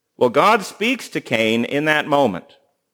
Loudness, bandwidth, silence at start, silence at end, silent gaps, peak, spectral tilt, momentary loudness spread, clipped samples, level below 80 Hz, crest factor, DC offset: -18 LUFS; over 20 kHz; 0.2 s; 0.55 s; none; 0 dBFS; -4.5 dB/octave; 7 LU; under 0.1%; -68 dBFS; 18 dB; under 0.1%